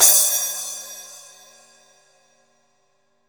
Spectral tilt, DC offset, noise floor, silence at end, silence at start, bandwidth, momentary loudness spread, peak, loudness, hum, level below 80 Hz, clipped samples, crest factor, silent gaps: 3 dB/octave; under 0.1%; -67 dBFS; 2.1 s; 0 s; over 20 kHz; 26 LU; 0 dBFS; -18 LUFS; none; -82 dBFS; under 0.1%; 24 dB; none